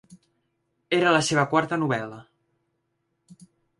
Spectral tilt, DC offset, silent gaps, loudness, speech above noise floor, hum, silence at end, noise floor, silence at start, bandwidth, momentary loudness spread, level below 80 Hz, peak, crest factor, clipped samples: -4.5 dB/octave; under 0.1%; none; -23 LUFS; 53 dB; none; 1.6 s; -76 dBFS; 0.1 s; 11.5 kHz; 9 LU; -66 dBFS; -6 dBFS; 22 dB; under 0.1%